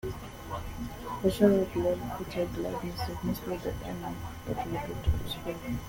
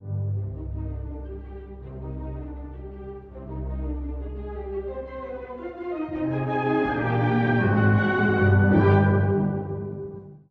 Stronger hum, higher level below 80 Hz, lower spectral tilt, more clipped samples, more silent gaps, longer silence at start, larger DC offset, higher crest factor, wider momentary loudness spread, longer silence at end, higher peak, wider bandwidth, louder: neither; about the same, -42 dBFS vs -38 dBFS; second, -6.5 dB/octave vs -10.5 dB/octave; neither; neither; about the same, 0.05 s vs 0 s; neither; about the same, 22 dB vs 18 dB; second, 15 LU vs 19 LU; about the same, 0 s vs 0.1 s; second, -10 dBFS vs -6 dBFS; first, 17 kHz vs 4.7 kHz; second, -32 LUFS vs -25 LUFS